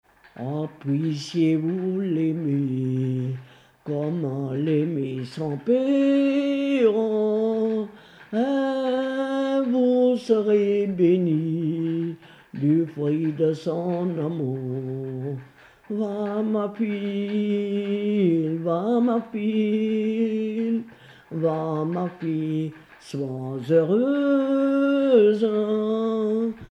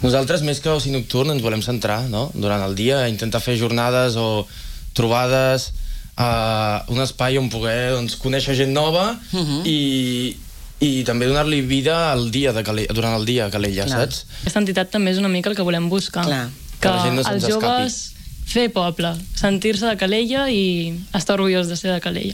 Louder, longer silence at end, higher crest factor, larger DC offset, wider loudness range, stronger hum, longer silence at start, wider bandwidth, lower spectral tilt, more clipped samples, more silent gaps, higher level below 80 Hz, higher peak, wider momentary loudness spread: second, -24 LUFS vs -20 LUFS; about the same, 0.05 s vs 0 s; about the same, 16 dB vs 16 dB; neither; first, 6 LU vs 1 LU; neither; first, 0.35 s vs 0 s; second, 9.8 kHz vs 17 kHz; first, -8.5 dB/octave vs -5 dB/octave; neither; neither; second, -68 dBFS vs -36 dBFS; second, -8 dBFS vs -4 dBFS; first, 10 LU vs 6 LU